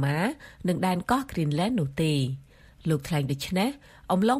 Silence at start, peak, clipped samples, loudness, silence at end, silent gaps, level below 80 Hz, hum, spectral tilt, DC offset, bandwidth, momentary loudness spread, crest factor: 0 s; -10 dBFS; under 0.1%; -28 LUFS; 0 s; none; -52 dBFS; none; -6 dB/octave; under 0.1%; 15.5 kHz; 7 LU; 18 dB